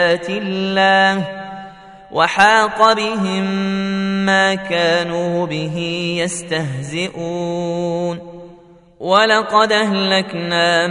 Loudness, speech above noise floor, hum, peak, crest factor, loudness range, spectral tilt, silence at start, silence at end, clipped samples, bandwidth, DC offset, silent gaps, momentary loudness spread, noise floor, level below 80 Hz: -16 LUFS; 28 dB; none; 0 dBFS; 16 dB; 6 LU; -4.5 dB/octave; 0 s; 0 s; under 0.1%; 11 kHz; under 0.1%; none; 11 LU; -44 dBFS; -54 dBFS